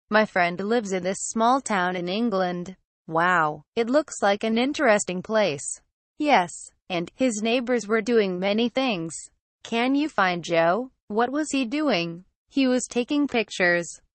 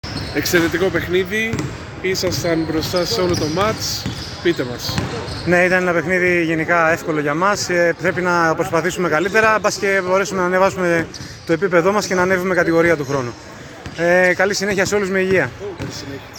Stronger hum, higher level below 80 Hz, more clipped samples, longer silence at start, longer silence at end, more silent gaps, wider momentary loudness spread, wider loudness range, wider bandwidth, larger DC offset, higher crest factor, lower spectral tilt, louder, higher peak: neither; second, -64 dBFS vs -42 dBFS; neither; about the same, 0.1 s vs 0.05 s; first, 0.2 s vs 0 s; first, 2.85-3.05 s, 3.68-3.72 s, 5.92-6.16 s, 9.40-9.59 s, 11.02-11.08 s, 12.35-12.46 s vs none; about the same, 9 LU vs 10 LU; about the same, 1 LU vs 3 LU; second, 8.4 kHz vs 19 kHz; neither; about the same, 16 dB vs 16 dB; about the same, -4 dB/octave vs -4.5 dB/octave; second, -24 LUFS vs -17 LUFS; second, -8 dBFS vs 0 dBFS